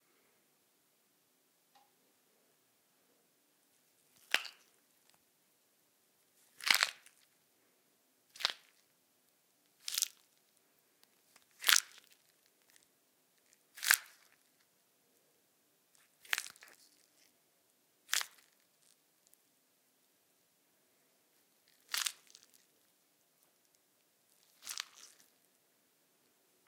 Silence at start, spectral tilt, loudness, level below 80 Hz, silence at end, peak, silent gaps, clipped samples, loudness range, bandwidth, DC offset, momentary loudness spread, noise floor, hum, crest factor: 4.35 s; 3.5 dB/octave; -34 LUFS; under -90 dBFS; 1.85 s; -4 dBFS; none; under 0.1%; 11 LU; 17.5 kHz; under 0.1%; 26 LU; -75 dBFS; none; 40 dB